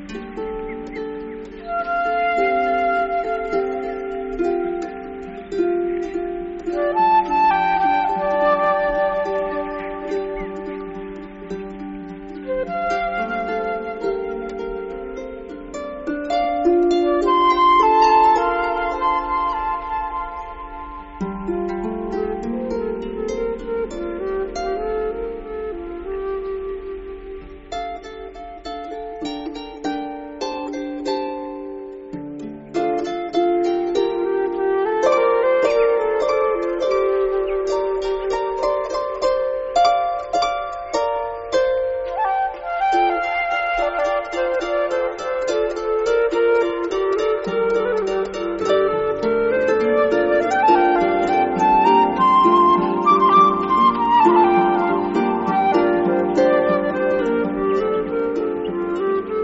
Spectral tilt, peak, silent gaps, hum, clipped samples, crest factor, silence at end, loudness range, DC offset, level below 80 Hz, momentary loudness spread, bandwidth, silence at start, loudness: -3.5 dB/octave; -4 dBFS; none; none; under 0.1%; 16 dB; 0 s; 12 LU; under 0.1%; -44 dBFS; 16 LU; 8 kHz; 0 s; -20 LUFS